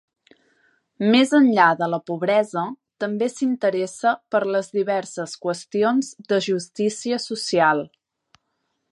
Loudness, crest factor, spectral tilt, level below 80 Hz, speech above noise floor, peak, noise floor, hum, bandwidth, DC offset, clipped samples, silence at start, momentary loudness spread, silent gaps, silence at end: -21 LUFS; 20 dB; -4.5 dB/octave; -74 dBFS; 54 dB; -2 dBFS; -74 dBFS; none; 11.5 kHz; under 0.1%; under 0.1%; 1 s; 12 LU; none; 1.05 s